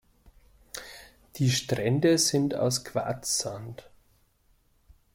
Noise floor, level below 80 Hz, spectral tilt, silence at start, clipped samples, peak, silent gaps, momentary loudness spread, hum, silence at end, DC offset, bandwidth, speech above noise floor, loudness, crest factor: -66 dBFS; -60 dBFS; -4 dB/octave; 0.75 s; under 0.1%; -12 dBFS; none; 22 LU; none; 1.35 s; under 0.1%; 16.5 kHz; 39 dB; -26 LUFS; 18 dB